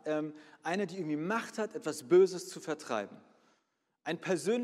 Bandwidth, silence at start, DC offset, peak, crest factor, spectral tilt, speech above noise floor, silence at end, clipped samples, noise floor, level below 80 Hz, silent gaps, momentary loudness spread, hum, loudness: 13.5 kHz; 0.05 s; under 0.1%; -14 dBFS; 18 dB; -5 dB/octave; 47 dB; 0 s; under 0.1%; -80 dBFS; -88 dBFS; none; 15 LU; none; -33 LUFS